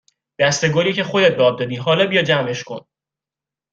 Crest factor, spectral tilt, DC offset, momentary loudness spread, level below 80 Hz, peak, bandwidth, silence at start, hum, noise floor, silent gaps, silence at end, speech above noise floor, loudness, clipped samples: 18 dB; -4 dB/octave; under 0.1%; 11 LU; -60 dBFS; -2 dBFS; 7.8 kHz; 0.4 s; none; -88 dBFS; none; 0.95 s; 71 dB; -17 LUFS; under 0.1%